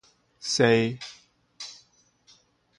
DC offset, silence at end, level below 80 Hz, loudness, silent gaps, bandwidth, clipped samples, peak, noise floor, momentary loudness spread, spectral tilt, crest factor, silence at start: under 0.1%; 1.05 s; -68 dBFS; -24 LUFS; none; 11.5 kHz; under 0.1%; -8 dBFS; -62 dBFS; 20 LU; -4.5 dB/octave; 22 dB; 0.4 s